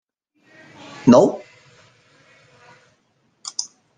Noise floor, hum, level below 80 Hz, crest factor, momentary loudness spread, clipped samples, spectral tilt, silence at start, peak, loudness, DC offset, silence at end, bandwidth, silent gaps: -65 dBFS; none; -60 dBFS; 22 dB; 23 LU; under 0.1%; -5.5 dB/octave; 1.05 s; -2 dBFS; -17 LUFS; under 0.1%; 0.35 s; 9.6 kHz; none